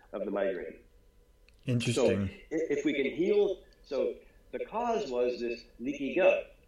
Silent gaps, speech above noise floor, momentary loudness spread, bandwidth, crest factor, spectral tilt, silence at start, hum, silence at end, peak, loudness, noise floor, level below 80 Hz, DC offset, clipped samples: none; 31 dB; 14 LU; 12 kHz; 20 dB; -6 dB/octave; 0.1 s; none; 0.2 s; -12 dBFS; -31 LUFS; -61 dBFS; -60 dBFS; under 0.1%; under 0.1%